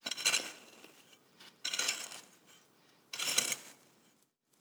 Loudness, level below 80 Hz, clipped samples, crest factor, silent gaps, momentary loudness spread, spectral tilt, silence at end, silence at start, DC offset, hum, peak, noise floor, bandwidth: -34 LUFS; under -90 dBFS; under 0.1%; 28 dB; none; 24 LU; 1.5 dB/octave; 0.85 s; 0.05 s; under 0.1%; none; -12 dBFS; -73 dBFS; over 20 kHz